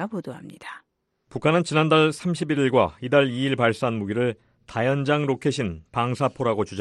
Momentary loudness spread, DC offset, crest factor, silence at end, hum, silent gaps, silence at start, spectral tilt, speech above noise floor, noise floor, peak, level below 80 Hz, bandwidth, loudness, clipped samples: 18 LU; under 0.1%; 18 dB; 0 s; none; none; 0 s; -6 dB/octave; 36 dB; -59 dBFS; -4 dBFS; -56 dBFS; 12 kHz; -23 LUFS; under 0.1%